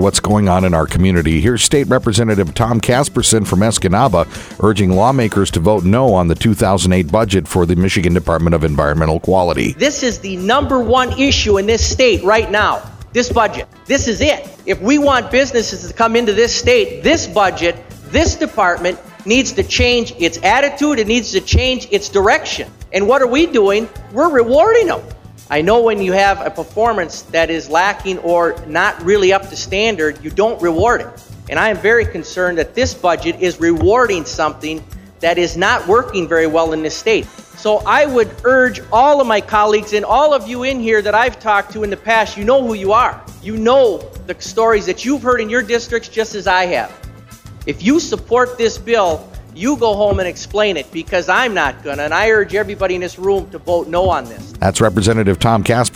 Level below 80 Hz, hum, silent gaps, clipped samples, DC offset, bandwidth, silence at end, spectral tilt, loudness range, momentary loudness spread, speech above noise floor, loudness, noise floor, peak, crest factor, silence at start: -32 dBFS; none; none; under 0.1%; under 0.1%; 16 kHz; 0 s; -4.5 dB/octave; 3 LU; 7 LU; 22 dB; -14 LUFS; -36 dBFS; 0 dBFS; 14 dB; 0 s